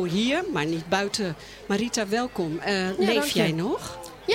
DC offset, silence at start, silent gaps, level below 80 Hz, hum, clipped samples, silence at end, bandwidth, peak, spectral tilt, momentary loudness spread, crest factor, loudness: under 0.1%; 0 s; none; -54 dBFS; none; under 0.1%; 0 s; 16.5 kHz; -10 dBFS; -4.5 dB/octave; 9 LU; 16 dB; -26 LUFS